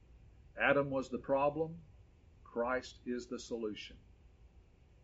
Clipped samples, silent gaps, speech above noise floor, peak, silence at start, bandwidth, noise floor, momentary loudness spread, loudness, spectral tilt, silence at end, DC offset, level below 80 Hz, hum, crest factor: under 0.1%; none; 26 dB; -16 dBFS; 0.1 s; 7.6 kHz; -63 dBFS; 16 LU; -37 LUFS; -4 dB/octave; 0.45 s; under 0.1%; -62 dBFS; none; 22 dB